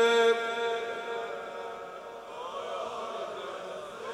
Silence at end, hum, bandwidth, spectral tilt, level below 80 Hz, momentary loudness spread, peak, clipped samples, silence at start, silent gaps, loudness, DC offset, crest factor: 0 s; none; 12 kHz; -2 dB/octave; -76 dBFS; 15 LU; -14 dBFS; under 0.1%; 0 s; none; -33 LUFS; under 0.1%; 18 dB